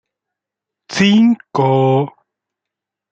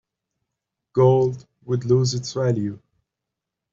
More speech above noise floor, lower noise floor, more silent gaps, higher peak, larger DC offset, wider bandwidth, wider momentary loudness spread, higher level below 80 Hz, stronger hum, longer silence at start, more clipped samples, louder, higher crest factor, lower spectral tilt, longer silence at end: first, 71 dB vs 64 dB; about the same, -83 dBFS vs -84 dBFS; neither; first, -2 dBFS vs -6 dBFS; neither; about the same, 8.2 kHz vs 7.6 kHz; about the same, 11 LU vs 10 LU; about the same, -60 dBFS vs -58 dBFS; neither; about the same, 0.9 s vs 0.95 s; neither; first, -14 LUFS vs -21 LUFS; about the same, 14 dB vs 18 dB; about the same, -6.5 dB/octave vs -7 dB/octave; about the same, 1 s vs 0.95 s